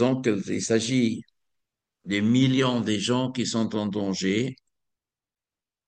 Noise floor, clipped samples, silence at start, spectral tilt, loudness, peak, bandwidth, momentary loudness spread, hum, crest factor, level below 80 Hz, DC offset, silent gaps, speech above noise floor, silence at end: under -90 dBFS; under 0.1%; 0 s; -5 dB/octave; -25 LUFS; -8 dBFS; 9.8 kHz; 7 LU; none; 18 dB; -66 dBFS; under 0.1%; none; over 66 dB; 1.35 s